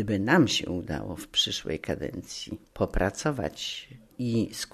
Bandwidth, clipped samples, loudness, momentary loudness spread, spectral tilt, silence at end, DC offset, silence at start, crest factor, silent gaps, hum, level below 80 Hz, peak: 13.5 kHz; under 0.1%; -28 LUFS; 15 LU; -4.5 dB/octave; 0.05 s; under 0.1%; 0 s; 20 dB; none; none; -44 dBFS; -8 dBFS